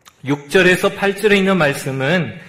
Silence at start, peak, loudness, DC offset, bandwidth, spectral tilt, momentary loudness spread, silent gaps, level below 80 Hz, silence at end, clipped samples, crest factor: 0.25 s; 0 dBFS; -15 LUFS; under 0.1%; 16 kHz; -5 dB/octave; 8 LU; none; -48 dBFS; 0 s; under 0.1%; 16 dB